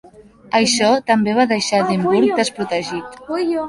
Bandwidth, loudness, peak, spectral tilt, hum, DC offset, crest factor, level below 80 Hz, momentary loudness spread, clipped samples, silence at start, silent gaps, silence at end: 11.5 kHz; -17 LUFS; -2 dBFS; -4 dB/octave; none; under 0.1%; 16 dB; -56 dBFS; 8 LU; under 0.1%; 0.2 s; none; 0 s